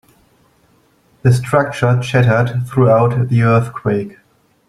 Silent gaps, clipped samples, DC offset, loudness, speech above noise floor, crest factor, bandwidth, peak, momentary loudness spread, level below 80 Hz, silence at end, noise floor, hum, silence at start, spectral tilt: none; under 0.1%; under 0.1%; -14 LUFS; 41 dB; 14 dB; 12 kHz; 0 dBFS; 7 LU; -46 dBFS; 0.6 s; -55 dBFS; none; 1.25 s; -7.5 dB/octave